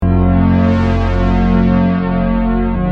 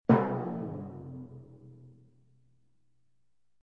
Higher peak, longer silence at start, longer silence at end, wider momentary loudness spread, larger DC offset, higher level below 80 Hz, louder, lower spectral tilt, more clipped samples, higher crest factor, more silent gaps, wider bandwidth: first, -2 dBFS vs -10 dBFS; about the same, 0 s vs 0.1 s; second, 0 s vs 1.7 s; second, 3 LU vs 27 LU; neither; first, -20 dBFS vs -66 dBFS; first, -13 LUFS vs -33 LUFS; second, -9.5 dB/octave vs -11 dB/octave; neither; second, 10 dB vs 26 dB; neither; first, 6.2 kHz vs 5 kHz